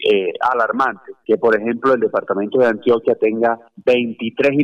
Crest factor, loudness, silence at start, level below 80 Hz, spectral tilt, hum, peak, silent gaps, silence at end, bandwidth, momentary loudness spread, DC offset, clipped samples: 12 dB; -17 LUFS; 0 s; -62 dBFS; -6.5 dB/octave; none; -6 dBFS; none; 0 s; 7.8 kHz; 5 LU; under 0.1%; under 0.1%